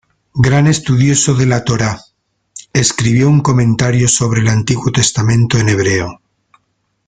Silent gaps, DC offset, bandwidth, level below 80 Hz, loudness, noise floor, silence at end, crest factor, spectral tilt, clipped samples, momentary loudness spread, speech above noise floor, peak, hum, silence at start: none; under 0.1%; 9.6 kHz; -40 dBFS; -12 LUFS; -65 dBFS; 0.95 s; 12 dB; -5 dB/octave; under 0.1%; 6 LU; 53 dB; 0 dBFS; none; 0.35 s